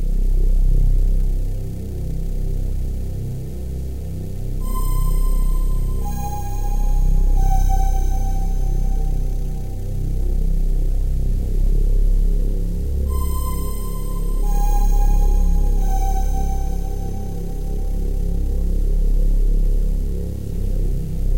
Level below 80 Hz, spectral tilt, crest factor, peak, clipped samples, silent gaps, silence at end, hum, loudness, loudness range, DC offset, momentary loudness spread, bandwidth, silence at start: -18 dBFS; -7 dB/octave; 10 dB; -6 dBFS; under 0.1%; none; 0 s; none; -24 LUFS; 3 LU; 3%; 7 LU; 16 kHz; 0 s